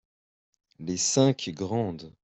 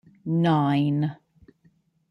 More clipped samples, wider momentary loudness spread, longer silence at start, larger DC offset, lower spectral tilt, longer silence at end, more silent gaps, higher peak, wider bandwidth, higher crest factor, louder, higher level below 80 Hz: neither; first, 12 LU vs 7 LU; first, 0.8 s vs 0.25 s; neither; second, -4.5 dB/octave vs -9 dB/octave; second, 0.15 s vs 0.95 s; neither; about the same, -10 dBFS vs -10 dBFS; first, 8.4 kHz vs 6 kHz; first, 20 dB vs 14 dB; about the same, -26 LUFS vs -24 LUFS; about the same, -64 dBFS vs -66 dBFS